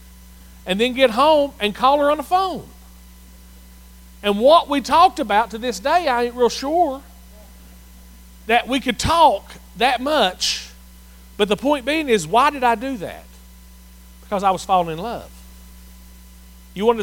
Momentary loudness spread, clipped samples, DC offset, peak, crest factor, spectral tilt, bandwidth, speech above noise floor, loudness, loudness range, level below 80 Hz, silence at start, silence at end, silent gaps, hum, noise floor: 14 LU; under 0.1%; under 0.1%; -2 dBFS; 18 dB; -3.5 dB/octave; 17 kHz; 25 dB; -18 LUFS; 6 LU; -42 dBFS; 0.65 s; 0 s; none; none; -43 dBFS